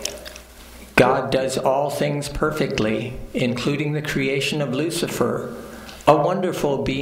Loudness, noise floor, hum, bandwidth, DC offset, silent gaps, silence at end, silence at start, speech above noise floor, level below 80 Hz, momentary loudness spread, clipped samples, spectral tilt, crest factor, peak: -21 LUFS; -42 dBFS; none; 16 kHz; under 0.1%; none; 0 s; 0 s; 21 dB; -42 dBFS; 14 LU; under 0.1%; -5 dB/octave; 22 dB; 0 dBFS